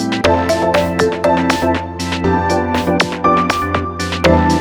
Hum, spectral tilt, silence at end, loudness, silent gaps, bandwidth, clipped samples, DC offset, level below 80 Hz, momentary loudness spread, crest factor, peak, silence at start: none; -5.5 dB/octave; 0 s; -15 LUFS; none; over 20 kHz; under 0.1%; under 0.1%; -32 dBFS; 6 LU; 14 dB; 0 dBFS; 0 s